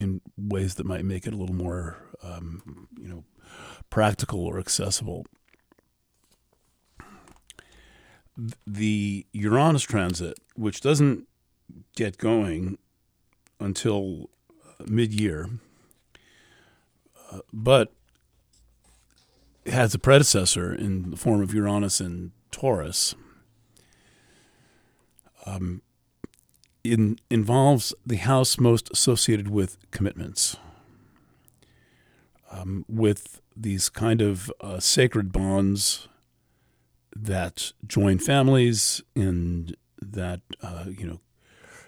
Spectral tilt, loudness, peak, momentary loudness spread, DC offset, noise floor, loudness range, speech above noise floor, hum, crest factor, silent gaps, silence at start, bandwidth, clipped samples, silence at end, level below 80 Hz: -4.5 dB/octave; -24 LUFS; -2 dBFS; 20 LU; under 0.1%; -69 dBFS; 10 LU; 45 dB; none; 24 dB; none; 0 s; 19.5 kHz; under 0.1%; 0.1 s; -48 dBFS